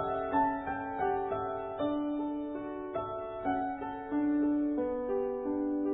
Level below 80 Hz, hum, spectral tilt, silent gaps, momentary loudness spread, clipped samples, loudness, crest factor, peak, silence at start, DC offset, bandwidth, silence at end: -58 dBFS; none; -2 dB/octave; none; 7 LU; under 0.1%; -33 LUFS; 16 dB; -18 dBFS; 0 s; under 0.1%; 3.9 kHz; 0 s